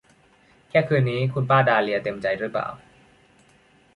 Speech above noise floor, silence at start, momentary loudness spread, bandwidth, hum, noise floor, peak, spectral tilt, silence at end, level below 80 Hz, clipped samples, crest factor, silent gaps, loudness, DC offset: 36 dB; 0.75 s; 9 LU; 10.5 kHz; none; -57 dBFS; -6 dBFS; -8 dB/octave; 1.2 s; -60 dBFS; under 0.1%; 18 dB; none; -22 LUFS; under 0.1%